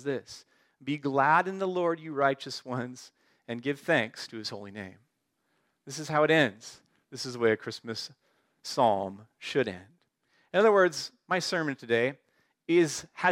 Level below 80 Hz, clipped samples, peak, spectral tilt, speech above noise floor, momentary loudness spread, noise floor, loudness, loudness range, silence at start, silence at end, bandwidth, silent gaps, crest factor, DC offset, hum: -78 dBFS; under 0.1%; -10 dBFS; -4.5 dB/octave; 48 dB; 19 LU; -77 dBFS; -28 LUFS; 4 LU; 0 s; 0 s; 16 kHz; none; 20 dB; under 0.1%; none